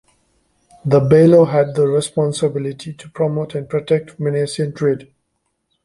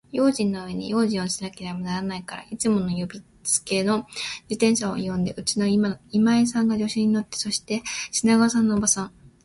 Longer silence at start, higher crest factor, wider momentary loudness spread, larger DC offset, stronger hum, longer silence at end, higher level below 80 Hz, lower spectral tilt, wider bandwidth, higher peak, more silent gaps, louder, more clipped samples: first, 0.85 s vs 0.15 s; about the same, 16 dB vs 18 dB; first, 15 LU vs 11 LU; neither; neither; first, 0.8 s vs 0.15 s; about the same, -54 dBFS vs -56 dBFS; first, -7 dB/octave vs -4 dB/octave; about the same, 11.5 kHz vs 11.5 kHz; first, 0 dBFS vs -6 dBFS; neither; first, -16 LUFS vs -23 LUFS; neither